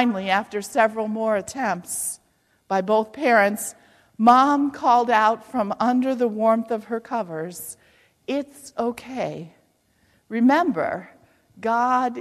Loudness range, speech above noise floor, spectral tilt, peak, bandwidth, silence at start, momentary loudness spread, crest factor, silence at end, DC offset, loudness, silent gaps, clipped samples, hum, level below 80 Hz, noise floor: 9 LU; 42 dB; -4.5 dB/octave; -4 dBFS; 14.5 kHz; 0 s; 13 LU; 18 dB; 0 s; under 0.1%; -22 LUFS; none; under 0.1%; none; -66 dBFS; -63 dBFS